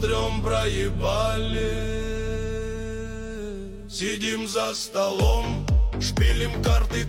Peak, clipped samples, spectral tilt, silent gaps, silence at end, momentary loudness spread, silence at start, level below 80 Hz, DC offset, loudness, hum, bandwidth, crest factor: -8 dBFS; under 0.1%; -5 dB/octave; none; 0 s; 11 LU; 0 s; -28 dBFS; under 0.1%; -26 LUFS; none; 16 kHz; 16 dB